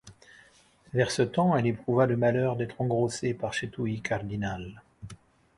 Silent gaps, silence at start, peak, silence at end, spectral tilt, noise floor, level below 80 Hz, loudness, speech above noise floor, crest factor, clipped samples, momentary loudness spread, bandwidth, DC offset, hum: none; 0.05 s; -10 dBFS; 0.4 s; -6 dB/octave; -59 dBFS; -56 dBFS; -28 LUFS; 32 dB; 18 dB; under 0.1%; 18 LU; 11.5 kHz; under 0.1%; none